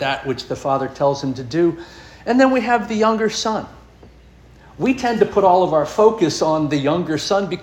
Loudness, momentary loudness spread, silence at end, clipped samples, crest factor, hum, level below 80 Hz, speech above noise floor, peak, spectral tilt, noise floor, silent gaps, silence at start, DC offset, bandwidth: -18 LUFS; 9 LU; 0 s; under 0.1%; 18 dB; none; -48 dBFS; 28 dB; -2 dBFS; -5 dB/octave; -45 dBFS; none; 0 s; under 0.1%; 16 kHz